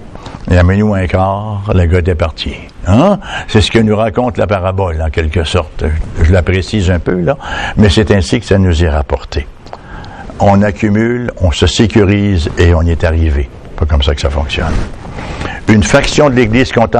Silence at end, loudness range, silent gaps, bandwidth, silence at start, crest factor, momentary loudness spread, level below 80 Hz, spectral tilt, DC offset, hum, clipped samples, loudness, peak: 0 s; 2 LU; none; 10 kHz; 0 s; 10 dB; 12 LU; -20 dBFS; -6 dB/octave; under 0.1%; none; 0.4%; -12 LUFS; 0 dBFS